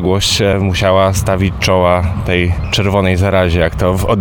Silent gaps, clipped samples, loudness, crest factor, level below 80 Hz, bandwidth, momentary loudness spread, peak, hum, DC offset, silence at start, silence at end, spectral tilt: none; under 0.1%; -13 LUFS; 12 dB; -26 dBFS; 18 kHz; 4 LU; 0 dBFS; none; under 0.1%; 0 s; 0 s; -5 dB/octave